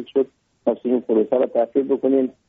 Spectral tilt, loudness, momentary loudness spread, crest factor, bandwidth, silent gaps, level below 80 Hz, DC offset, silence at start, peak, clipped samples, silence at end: -6.5 dB/octave; -21 LUFS; 6 LU; 14 dB; 3.8 kHz; none; -68 dBFS; under 0.1%; 0 s; -6 dBFS; under 0.1%; 0.15 s